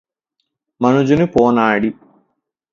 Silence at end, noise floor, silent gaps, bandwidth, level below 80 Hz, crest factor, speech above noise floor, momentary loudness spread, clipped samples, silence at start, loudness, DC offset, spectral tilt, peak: 0.8 s; -73 dBFS; none; 7.4 kHz; -48 dBFS; 16 dB; 60 dB; 6 LU; under 0.1%; 0.8 s; -15 LUFS; under 0.1%; -7.5 dB/octave; 0 dBFS